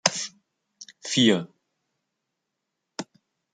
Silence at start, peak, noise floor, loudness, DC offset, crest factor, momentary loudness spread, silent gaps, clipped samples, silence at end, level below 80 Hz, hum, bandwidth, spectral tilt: 0.05 s; -2 dBFS; -82 dBFS; -23 LUFS; under 0.1%; 28 dB; 25 LU; none; under 0.1%; 0.5 s; -72 dBFS; none; 9.6 kHz; -3 dB/octave